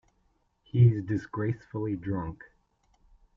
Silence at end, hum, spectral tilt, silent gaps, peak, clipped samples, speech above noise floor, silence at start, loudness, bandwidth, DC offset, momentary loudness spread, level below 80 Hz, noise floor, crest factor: 1 s; none; -10 dB/octave; none; -10 dBFS; under 0.1%; 44 dB; 0.75 s; -28 LUFS; 3.2 kHz; under 0.1%; 12 LU; -58 dBFS; -71 dBFS; 20 dB